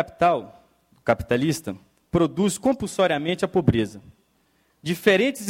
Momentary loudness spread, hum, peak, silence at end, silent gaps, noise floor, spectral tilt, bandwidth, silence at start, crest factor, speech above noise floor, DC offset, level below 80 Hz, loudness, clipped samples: 11 LU; none; -4 dBFS; 0 s; none; -65 dBFS; -5.5 dB/octave; 16.5 kHz; 0 s; 20 dB; 43 dB; under 0.1%; -48 dBFS; -23 LUFS; under 0.1%